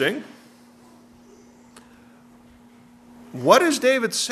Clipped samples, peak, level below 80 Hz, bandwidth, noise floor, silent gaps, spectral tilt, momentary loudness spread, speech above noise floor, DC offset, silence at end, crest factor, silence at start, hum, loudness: under 0.1%; 0 dBFS; -68 dBFS; 13.5 kHz; -50 dBFS; none; -3 dB/octave; 22 LU; 31 dB; under 0.1%; 0 s; 24 dB; 0 s; none; -19 LUFS